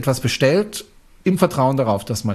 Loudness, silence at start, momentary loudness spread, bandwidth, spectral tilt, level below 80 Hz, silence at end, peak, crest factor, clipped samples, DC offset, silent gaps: -19 LUFS; 0 s; 8 LU; 14.5 kHz; -5.5 dB/octave; -48 dBFS; 0 s; -2 dBFS; 16 dB; under 0.1%; under 0.1%; none